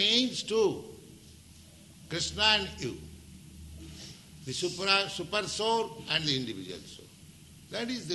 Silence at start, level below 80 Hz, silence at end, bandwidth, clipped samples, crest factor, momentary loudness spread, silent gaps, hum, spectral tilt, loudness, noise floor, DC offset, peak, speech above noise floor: 0 s; -56 dBFS; 0 s; 12 kHz; under 0.1%; 24 dB; 24 LU; none; none; -3 dB/octave; -29 LUFS; -53 dBFS; under 0.1%; -10 dBFS; 22 dB